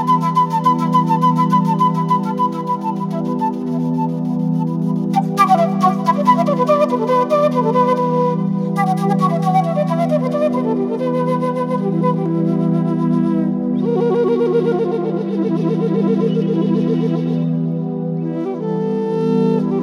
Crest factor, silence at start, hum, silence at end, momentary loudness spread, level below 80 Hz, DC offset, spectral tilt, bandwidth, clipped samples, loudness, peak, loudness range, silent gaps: 14 dB; 0 s; none; 0 s; 6 LU; -78 dBFS; under 0.1%; -8.5 dB/octave; 12.5 kHz; under 0.1%; -17 LUFS; -2 dBFS; 3 LU; none